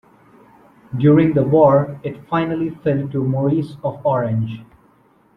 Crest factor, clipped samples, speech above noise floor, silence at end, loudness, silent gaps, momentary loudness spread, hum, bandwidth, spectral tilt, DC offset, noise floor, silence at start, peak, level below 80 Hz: 16 dB; under 0.1%; 38 dB; 0.75 s; -18 LUFS; none; 13 LU; none; 4.9 kHz; -10.5 dB/octave; under 0.1%; -55 dBFS; 0.9 s; -2 dBFS; -52 dBFS